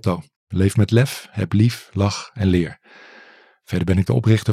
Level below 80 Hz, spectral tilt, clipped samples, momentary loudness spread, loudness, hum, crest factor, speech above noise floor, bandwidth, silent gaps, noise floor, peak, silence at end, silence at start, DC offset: -54 dBFS; -7 dB/octave; under 0.1%; 10 LU; -20 LUFS; none; 16 dB; 30 dB; 14.5 kHz; 0.36-0.47 s; -49 dBFS; -4 dBFS; 0 s; 0.05 s; under 0.1%